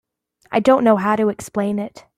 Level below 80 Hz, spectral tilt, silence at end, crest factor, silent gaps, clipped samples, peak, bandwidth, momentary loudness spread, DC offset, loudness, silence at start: -58 dBFS; -6.5 dB/octave; 0.2 s; 16 dB; none; under 0.1%; -2 dBFS; 14.5 kHz; 9 LU; under 0.1%; -18 LUFS; 0.5 s